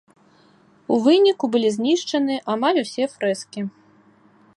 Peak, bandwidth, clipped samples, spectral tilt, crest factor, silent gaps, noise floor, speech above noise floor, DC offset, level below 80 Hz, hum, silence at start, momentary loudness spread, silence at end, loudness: -4 dBFS; 11.5 kHz; under 0.1%; -4.5 dB/octave; 16 dB; none; -55 dBFS; 35 dB; under 0.1%; -74 dBFS; none; 0.9 s; 15 LU; 0.9 s; -20 LUFS